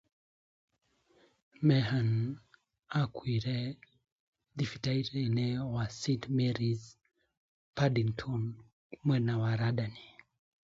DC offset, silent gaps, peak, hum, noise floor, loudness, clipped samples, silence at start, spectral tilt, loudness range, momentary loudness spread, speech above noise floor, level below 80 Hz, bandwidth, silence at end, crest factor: under 0.1%; 4.12-4.33 s, 7.37-7.73 s, 8.73-8.90 s; -14 dBFS; none; -68 dBFS; -33 LUFS; under 0.1%; 1.6 s; -7 dB/octave; 2 LU; 11 LU; 37 dB; -62 dBFS; 7.8 kHz; 0.55 s; 20 dB